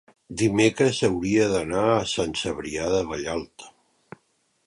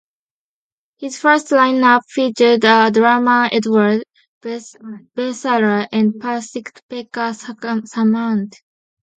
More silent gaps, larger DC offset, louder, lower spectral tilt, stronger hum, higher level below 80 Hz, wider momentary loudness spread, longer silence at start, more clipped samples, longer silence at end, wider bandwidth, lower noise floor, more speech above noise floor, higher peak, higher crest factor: second, none vs 4.27-4.41 s, 6.82-6.89 s; neither; second, -23 LUFS vs -15 LUFS; about the same, -4.5 dB/octave vs -5 dB/octave; neither; first, -50 dBFS vs -68 dBFS; second, 10 LU vs 18 LU; second, 0.3 s vs 1 s; neither; first, 1 s vs 0.7 s; first, 11.5 kHz vs 9 kHz; second, -68 dBFS vs under -90 dBFS; second, 45 dB vs over 74 dB; second, -6 dBFS vs 0 dBFS; about the same, 18 dB vs 16 dB